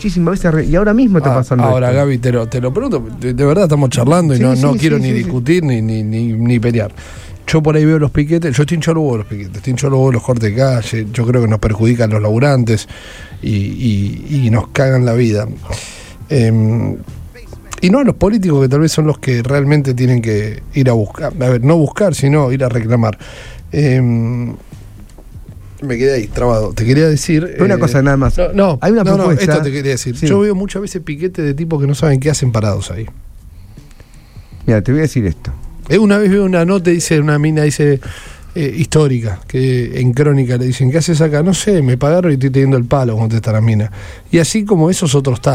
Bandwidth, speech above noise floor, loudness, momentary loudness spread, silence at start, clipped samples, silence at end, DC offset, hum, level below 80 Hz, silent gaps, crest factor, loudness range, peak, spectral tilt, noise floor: 14.5 kHz; 25 dB; -13 LUFS; 10 LU; 0 s; under 0.1%; 0 s; under 0.1%; none; -30 dBFS; none; 12 dB; 4 LU; 0 dBFS; -7 dB/octave; -38 dBFS